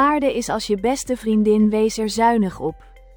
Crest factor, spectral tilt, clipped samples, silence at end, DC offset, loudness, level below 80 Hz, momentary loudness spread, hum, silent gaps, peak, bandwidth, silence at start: 14 dB; -5 dB/octave; under 0.1%; 0.4 s; under 0.1%; -19 LUFS; -44 dBFS; 7 LU; none; none; -4 dBFS; 19.5 kHz; 0 s